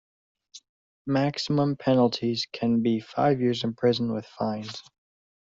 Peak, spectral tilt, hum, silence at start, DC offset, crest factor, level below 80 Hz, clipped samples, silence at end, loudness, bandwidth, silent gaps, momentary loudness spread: -8 dBFS; -6.5 dB/octave; none; 0.55 s; under 0.1%; 18 dB; -64 dBFS; under 0.1%; 0.8 s; -26 LUFS; 7.6 kHz; 0.69-1.05 s; 8 LU